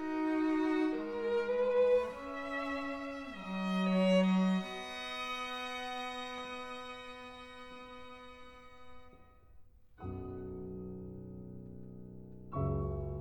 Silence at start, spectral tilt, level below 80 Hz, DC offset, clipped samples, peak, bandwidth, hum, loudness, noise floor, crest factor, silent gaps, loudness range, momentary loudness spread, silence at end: 0 s; -7 dB/octave; -56 dBFS; 0.1%; under 0.1%; -18 dBFS; 11.5 kHz; none; -35 LUFS; -58 dBFS; 18 dB; none; 16 LU; 21 LU; 0 s